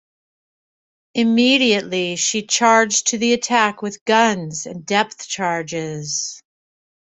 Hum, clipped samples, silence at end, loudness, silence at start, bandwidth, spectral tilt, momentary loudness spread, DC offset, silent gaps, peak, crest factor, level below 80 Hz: none; under 0.1%; 0.8 s; -18 LUFS; 1.15 s; 8.4 kHz; -2.5 dB/octave; 12 LU; under 0.1%; 4.01-4.06 s; -2 dBFS; 18 dB; -64 dBFS